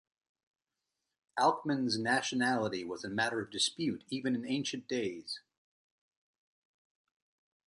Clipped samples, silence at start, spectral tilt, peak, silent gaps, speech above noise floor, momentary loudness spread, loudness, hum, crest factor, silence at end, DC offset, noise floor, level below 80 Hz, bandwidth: under 0.1%; 1.35 s; -3.5 dB/octave; -16 dBFS; none; 55 dB; 9 LU; -34 LUFS; none; 22 dB; 2.3 s; under 0.1%; -88 dBFS; -76 dBFS; 11 kHz